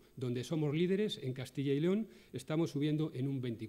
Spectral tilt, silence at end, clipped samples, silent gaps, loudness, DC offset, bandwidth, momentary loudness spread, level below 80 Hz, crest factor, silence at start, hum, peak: -7 dB/octave; 0 s; under 0.1%; none; -36 LUFS; under 0.1%; 15.5 kHz; 7 LU; -72 dBFS; 14 dB; 0.15 s; none; -22 dBFS